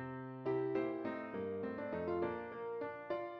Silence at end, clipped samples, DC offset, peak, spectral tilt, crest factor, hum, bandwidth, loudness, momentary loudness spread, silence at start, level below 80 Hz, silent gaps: 0 s; under 0.1%; under 0.1%; -26 dBFS; -6.5 dB/octave; 16 dB; none; 5.8 kHz; -41 LUFS; 6 LU; 0 s; -74 dBFS; none